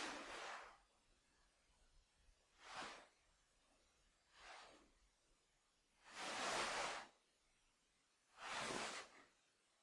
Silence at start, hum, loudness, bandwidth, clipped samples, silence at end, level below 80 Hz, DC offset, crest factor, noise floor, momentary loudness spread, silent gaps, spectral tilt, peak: 0 s; none; -48 LUFS; 12 kHz; under 0.1%; 0.55 s; -80 dBFS; under 0.1%; 22 dB; -82 dBFS; 20 LU; none; -1 dB/octave; -32 dBFS